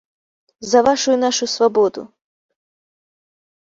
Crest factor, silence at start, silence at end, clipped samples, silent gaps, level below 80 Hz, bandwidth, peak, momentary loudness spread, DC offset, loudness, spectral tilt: 18 dB; 0.6 s; 1.65 s; under 0.1%; none; -60 dBFS; 7.8 kHz; -2 dBFS; 11 LU; under 0.1%; -16 LUFS; -2.5 dB/octave